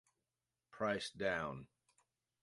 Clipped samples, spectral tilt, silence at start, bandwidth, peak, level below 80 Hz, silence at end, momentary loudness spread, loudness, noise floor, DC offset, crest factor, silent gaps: under 0.1%; -4.5 dB/octave; 0.75 s; 11.5 kHz; -24 dBFS; -72 dBFS; 0.8 s; 7 LU; -41 LUFS; under -90 dBFS; under 0.1%; 22 dB; none